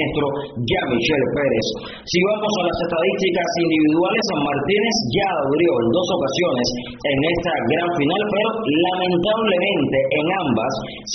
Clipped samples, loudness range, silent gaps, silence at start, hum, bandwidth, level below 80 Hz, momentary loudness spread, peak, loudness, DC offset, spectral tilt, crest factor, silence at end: under 0.1%; 1 LU; none; 0 s; none; 6.6 kHz; -46 dBFS; 5 LU; -6 dBFS; -19 LUFS; under 0.1%; -3.5 dB/octave; 14 dB; 0 s